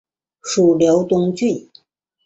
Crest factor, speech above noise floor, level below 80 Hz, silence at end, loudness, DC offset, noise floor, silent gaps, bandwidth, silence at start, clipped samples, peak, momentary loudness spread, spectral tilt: 14 dB; 37 dB; -58 dBFS; 0.65 s; -17 LUFS; under 0.1%; -53 dBFS; none; 8.2 kHz; 0.45 s; under 0.1%; -4 dBFS; 12 LU; -6 dB/octave